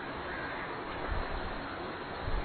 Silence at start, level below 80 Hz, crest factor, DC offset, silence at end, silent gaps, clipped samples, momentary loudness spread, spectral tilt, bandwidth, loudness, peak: 0 s; -42 dBFS; 16 dB; under 0.1%; 0 s; none; under 0.1%; 2 LU; -9 dB/octave; 4.5 kHz; -38 LUFS; -22 dBFS